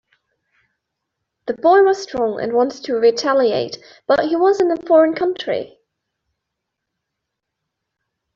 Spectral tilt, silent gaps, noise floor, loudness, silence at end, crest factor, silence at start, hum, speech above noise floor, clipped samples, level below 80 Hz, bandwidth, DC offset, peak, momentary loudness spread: -4.5 dB/octave; none; -79 dBFS; -17 LUFS; 2.7 s; 16 dB; 1.45 s; none; 63 dB; under 0.1%; -60 dBFS; 7.6 kHz; under 0.1%; -4 dBFS; 13 LU